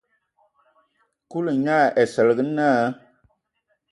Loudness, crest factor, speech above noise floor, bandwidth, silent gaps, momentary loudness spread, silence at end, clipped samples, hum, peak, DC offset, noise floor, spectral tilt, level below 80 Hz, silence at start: -20 LUFS; 18 dB; 53 dB; 11.5 kHz; none; 10 LU; 0.95 s; under 0.1%; none; -6 dBFS; under 0.1%; -72 dBFS; -6.5 dB/octave; -70 dBFS; 1.3 s